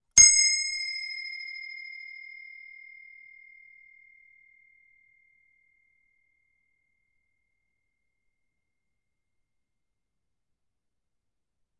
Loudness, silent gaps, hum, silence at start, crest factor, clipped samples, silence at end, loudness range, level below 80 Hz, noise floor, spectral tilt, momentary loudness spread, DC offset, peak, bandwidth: -21 LUFS; none; none; 0.15 s; 28 dB; under 0.1%; 9.6 s; 29 LU; -62 dBFS; -85 dBFS; 3.5 dB/octave; 30 LU; under 0.1%; -4 dBFS; 11.5 kHz